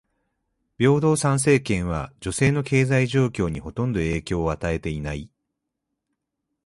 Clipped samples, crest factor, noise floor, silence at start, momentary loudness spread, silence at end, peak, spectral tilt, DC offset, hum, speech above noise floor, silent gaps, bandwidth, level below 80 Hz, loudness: under 0.1%; 18 dB; -81 dBFS; 0.8 s; 10 LU; 1.4 s; -6 dBFS; -6 dB/octave; under 0.1%; none; 59 dB; none; 11.5 kHz; -42 dBFS; -23 LUFS